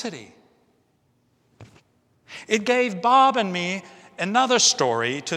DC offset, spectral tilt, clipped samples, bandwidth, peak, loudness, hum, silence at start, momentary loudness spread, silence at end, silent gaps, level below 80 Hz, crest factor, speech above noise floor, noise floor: under 0.1%; -2.5 dB/octave; under 0.1%; 13.5 kHz; -4 dBFS; -20 LUFS; none; 0 s; 17 LU; 0 s; none; -74 dBFS; 20 dB; 44 dB; -66 dBFS